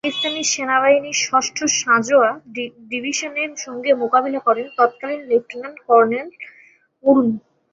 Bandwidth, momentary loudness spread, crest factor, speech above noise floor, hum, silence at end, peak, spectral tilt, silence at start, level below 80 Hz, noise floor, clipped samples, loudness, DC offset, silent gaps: 8 kHz; 14 LU; 18 dB; 33 dB; none; 0.35 s; -2 dBFS; -2 dB/octave; 0.05 s; -66 dBFS; -52 dBFS; under 0.1%; -18 LUFS; under 0.1%; none